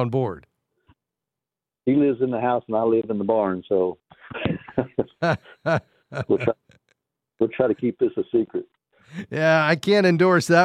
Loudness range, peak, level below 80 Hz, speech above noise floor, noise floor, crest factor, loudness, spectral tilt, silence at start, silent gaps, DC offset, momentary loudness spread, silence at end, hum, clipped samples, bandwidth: 4 LU; -4 dBFS; -58 dBFS; 67 dB; -88 dBFS; 18 dB; -22 LUFS; -6.5 dB/octave; 0 s; none; under 0.1%; 14 LU; 0 s; none; under 0.1%; 13.5 kHz